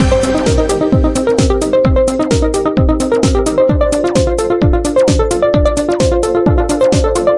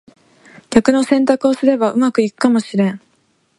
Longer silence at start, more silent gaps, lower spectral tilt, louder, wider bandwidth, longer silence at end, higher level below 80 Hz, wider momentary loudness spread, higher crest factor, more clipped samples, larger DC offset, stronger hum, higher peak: second, 0 s vs 0.7 s; neither; about the same, -6 dB/octave vs -6 dB/octave; first, -12 LUFS vs -15 LUFS; about the same, 11.5 kHz vs 11.5 kHz; second, 0 s vs 0.6 s; first, -20 dBFS vs -52 dBFS; second, 2 LU vs 5 LU; second, 10 dB vs 16 dB; neither; neither; neither; about the same, 0 dBFS vs 0 dBFS